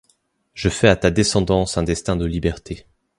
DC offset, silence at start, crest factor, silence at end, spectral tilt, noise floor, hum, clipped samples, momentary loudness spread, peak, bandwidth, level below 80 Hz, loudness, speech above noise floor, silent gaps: under 0.1%; 0.55 s; 20 dB; 0.4 s; -5 dB/octave; -64 dBFS; none; under 0.1%; 14 LU; 0 dBFS; 11.5 kHz; -34 dBFS; -19 LUFS; 46 dB; none